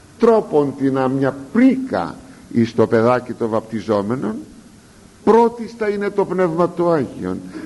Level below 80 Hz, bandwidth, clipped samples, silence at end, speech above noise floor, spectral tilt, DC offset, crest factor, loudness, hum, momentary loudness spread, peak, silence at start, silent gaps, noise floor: -54 dBFS; 11.5 kHz; under 0.1%; 0 s; 28 dB; -7.5 dB/octave; under 0.1%; 16 dB; -18 LUFS; none; 10 LU; -2 dBFS; 0.2 s; none; -45 dBFS